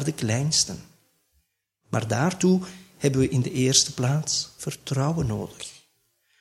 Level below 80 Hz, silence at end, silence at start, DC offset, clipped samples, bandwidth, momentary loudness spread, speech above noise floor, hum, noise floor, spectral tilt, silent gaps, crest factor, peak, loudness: -52 dBFS; 0.65 s; 0 s; under 0.1%; under 0.1%; 14.5 kHz; 15 LU; 48 dB; none; -72 dBFS; -4 dB/octave; none; 22 dB; -4 dBFS; -24 LUFS